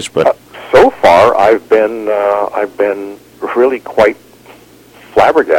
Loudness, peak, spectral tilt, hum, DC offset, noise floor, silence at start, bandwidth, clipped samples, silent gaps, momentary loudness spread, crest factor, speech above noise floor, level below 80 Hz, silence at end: -11 LUFS; 0 dBFS; -5 dB/octave; none; under 0.1%; -40 dBFS; 0 s; 17 kHz; 0.3%; none; 13 LU; 12 dB; 30 dB; -44 dBFS; 0 s